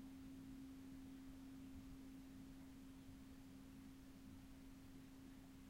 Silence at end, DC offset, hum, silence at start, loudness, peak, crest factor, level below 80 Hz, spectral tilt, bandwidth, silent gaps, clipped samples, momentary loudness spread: 0 s; under 0.1%; none; 0 s; -60 LUFS; -46 dBFS; 12 dB; -68 dBFS; -5.5 dB/octave; 16 kHz; none; under 0.1%; 4 LU